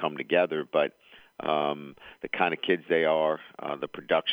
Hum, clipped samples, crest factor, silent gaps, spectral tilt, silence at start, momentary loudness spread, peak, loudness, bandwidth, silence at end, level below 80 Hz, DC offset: none; under 0.1%; 18 dB; none; -6.5 dB/octave; 0 s; 11 LU; -10 dBFS; -28 LUFS; over 20 kHz; 0 s; -72 dBFS; under 0.1%